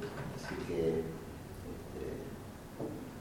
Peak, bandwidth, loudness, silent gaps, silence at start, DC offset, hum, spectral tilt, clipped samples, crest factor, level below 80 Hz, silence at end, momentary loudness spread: -22 dBFS; 17.5 kHz; -41 LUFS; none; 0 s; under 0.1%; none; -6.5 dB/octave; under 0.1%; 18 dB; -54 dBFS; 0 s; 13 LU